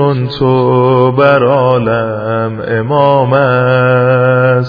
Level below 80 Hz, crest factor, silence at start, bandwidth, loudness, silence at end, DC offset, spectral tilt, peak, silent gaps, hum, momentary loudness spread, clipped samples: -46 dBFS; 10 dB; 0 s; 5 kHz; -10 LUFS; 0 s; under 0.1%; -10 dB/octave; 0 dBFS; none; none; 7 LU; 0.2%